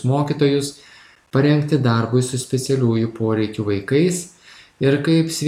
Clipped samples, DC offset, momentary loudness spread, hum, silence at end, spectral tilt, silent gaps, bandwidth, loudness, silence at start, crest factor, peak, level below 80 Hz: under 0.1%; under 0.1%; 6 LU; none; 0 s; -6 dB/octave; none; 15 kHz; -19 LUFS; 0 s; 14 dB; -4 dBFS; -58 dBFS